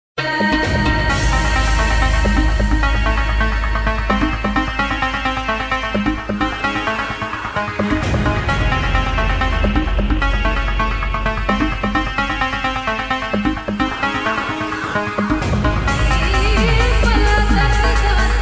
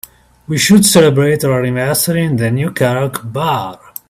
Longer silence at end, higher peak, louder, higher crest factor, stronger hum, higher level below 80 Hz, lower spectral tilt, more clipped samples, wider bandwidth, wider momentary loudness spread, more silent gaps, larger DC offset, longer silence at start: second, 0 s vs 0.35 s; about the same, -2 dBFS vs 0 dBFS; second, -18 LUFS vs -13 LUFS; about the same, 14 dB vs 14 dB; neither; first, -20 dBFS vs -46 dBFS; about the same, -5.5 dB/octave vs -4.5 dB/octave; neither; second, 8 kHz vs 16 kHz; second, 5 LU vs 11 LU; neither; neither; second, 0.15 s vs 0.5 s